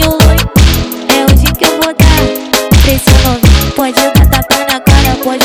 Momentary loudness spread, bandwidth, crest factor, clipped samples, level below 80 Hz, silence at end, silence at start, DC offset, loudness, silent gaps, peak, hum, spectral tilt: 4 LU; over 20 kHz; 8 dB; 3%; -12 dBFS; 0 s; 0 s; under 0.1%; -8 LUFS; none; 0 dBFS; none; -4.5 dB/octave